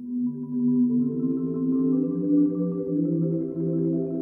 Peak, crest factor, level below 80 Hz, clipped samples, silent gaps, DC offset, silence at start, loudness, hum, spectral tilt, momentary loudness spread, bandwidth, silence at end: -12 dBFS; 12 dB; -64 dBFS; under 0.1%; none; under 0.1%; 0 s; -25 LUFS; none; -14.5 dB/octave; 5 LU; 1.5 kHz; 0 s